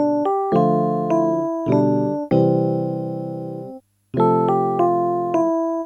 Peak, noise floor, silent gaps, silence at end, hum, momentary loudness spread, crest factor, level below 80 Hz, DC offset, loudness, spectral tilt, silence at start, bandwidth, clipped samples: -4 dBFS; -39 dBFS; none; 0 s; none; 11 LU; 14 dB; -58 dBFS; under 0.1%; -19 LUFS; -10 dB/octave; 0 s; 6.8 kHz; under 0.1%